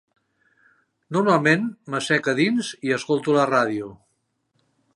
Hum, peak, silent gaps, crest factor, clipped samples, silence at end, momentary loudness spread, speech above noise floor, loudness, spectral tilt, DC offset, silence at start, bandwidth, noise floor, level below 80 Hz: none; -2 dBFS; none; 20 dB; under 0.1%; 1 s; 9 LU; 51 dB; -21 LUFS; -5.5 dB/octave; under 0.1%; 1.1 s; 11.5 kHz; -72 dBFS; -70 dBFS